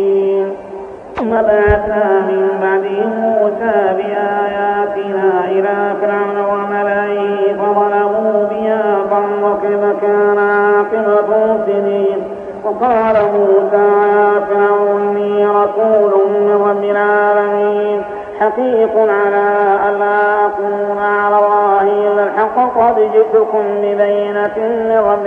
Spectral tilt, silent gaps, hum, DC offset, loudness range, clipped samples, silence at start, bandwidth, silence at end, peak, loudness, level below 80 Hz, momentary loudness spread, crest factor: -8 dB/octave; none; none; under 0.1%; 3 LU; under 0.1%; 0 s; 3.8 kHz; 0 s; 0 dBFS; -13 LUFS; -40 dBFS; 5 LU; 12 dB